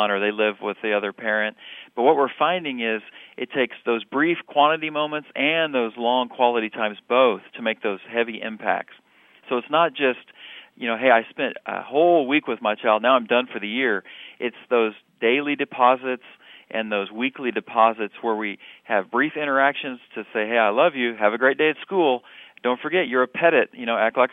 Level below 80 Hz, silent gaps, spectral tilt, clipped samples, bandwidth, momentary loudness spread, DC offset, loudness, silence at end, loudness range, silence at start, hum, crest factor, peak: -76 dBFS; none; -7.5 dB/octave; under 0.1%; 3.9 kHz; 11 LU; under 0.1%; -22 LUFS; 0.05 s; 3 LU; 0 s; none; 20 dB; -2 dBFS